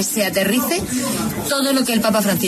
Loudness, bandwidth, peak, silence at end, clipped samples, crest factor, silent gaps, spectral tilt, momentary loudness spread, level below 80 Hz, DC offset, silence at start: -18 LUFS; 14 kHz; -6 dBFS; 0 s; under 0.1%; 12 dB; none; -3.5 dB/octave; 4 LU; -48 dBFS; under 0.1%; 0 s